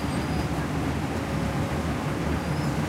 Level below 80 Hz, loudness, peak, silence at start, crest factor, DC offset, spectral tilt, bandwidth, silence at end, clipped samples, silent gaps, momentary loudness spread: -38 dBFS; -28 LUFS; -14 dBFS; 0 s; 12 dB; under 0.1%; -6 dB/octave; 16 kHz; 0 s; under 0.1%; none; 1 LU